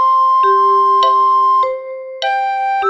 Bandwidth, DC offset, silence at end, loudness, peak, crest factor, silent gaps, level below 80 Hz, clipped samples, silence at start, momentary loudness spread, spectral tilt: 7.6 kHz; under 0.1%; 0 s; -12 LUFS; -2 dBFS; 10 dB; none; -64 dBFS; under 0.1%; 0 s; 9 LU; -1.5 dB/octave